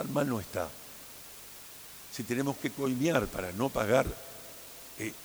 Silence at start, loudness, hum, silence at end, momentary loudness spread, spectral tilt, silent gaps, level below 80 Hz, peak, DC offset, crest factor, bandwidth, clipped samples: 0 s; -32 LUFS; none; 0 s; 17 LU; -5 dB/octave; none; -54 dBFS; -10 dBFS; under 0.1%; 22 dB; over 20 kHz; under 0.1%